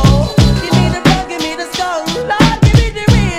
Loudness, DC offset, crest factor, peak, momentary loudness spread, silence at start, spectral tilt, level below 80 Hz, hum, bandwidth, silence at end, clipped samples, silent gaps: -12 LUFS; under 0.1%; 12 dB; 0 dBFS; 8 LU; 0 s; -5.5 dB/octave; -20 dBFS; none; 15 kHz; 0 s; 0.4%; none